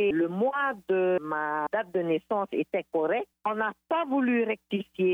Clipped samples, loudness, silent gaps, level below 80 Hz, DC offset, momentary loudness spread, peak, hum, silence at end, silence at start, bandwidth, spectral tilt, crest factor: under 0.1%; -28 LUFS; none; -72 dBFS; under 0.1%; 4 LU; -18 dBFS; none; 0 s; 0 s; 3.9 kHz; -8 dB/octave; 10 dB